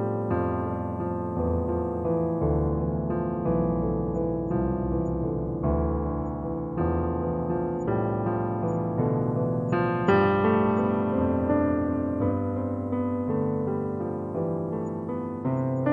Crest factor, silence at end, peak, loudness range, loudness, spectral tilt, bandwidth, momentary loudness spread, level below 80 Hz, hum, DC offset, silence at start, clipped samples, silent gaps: 16 dB; 0 s; -10 dBFS; 4 LU; -27 LUFS; -10.5 dB/octave; 7.4 kHz; 6 LU; -42 dBFS; none; under 0.1%; 0 s; under 0.1%; none